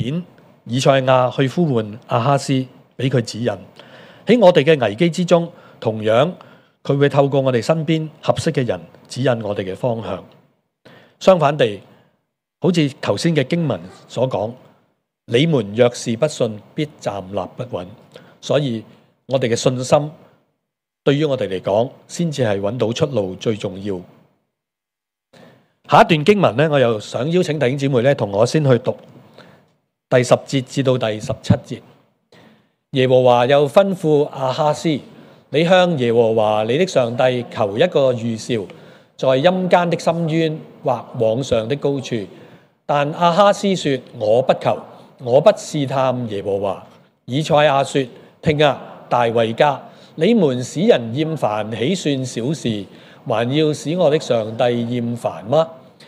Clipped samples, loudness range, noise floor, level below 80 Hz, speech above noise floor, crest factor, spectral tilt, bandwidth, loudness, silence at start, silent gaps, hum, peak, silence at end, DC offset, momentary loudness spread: under 0.1%; 5 LU; -85 dBFS; -58 dBFS; 68 dB; 18 dB; -6 dB/octave; 13 kHz; -18 LUFS; 0 s; none; none; 0 dBFS; 0.3 s; under 0.1%; 12 LU